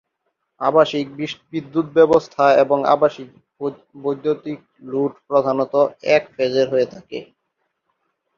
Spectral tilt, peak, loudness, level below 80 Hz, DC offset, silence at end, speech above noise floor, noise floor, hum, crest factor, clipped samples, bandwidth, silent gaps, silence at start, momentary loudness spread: -6 dB/octave; -2 dBFS; -19 LUFS; -62 dBFS; under 0.1%; 1.15 s; 55 dB; -74 dBFS; none; 18 dB; under 0.1%; 7.2 kHz; none; 0.6 s; 14 LU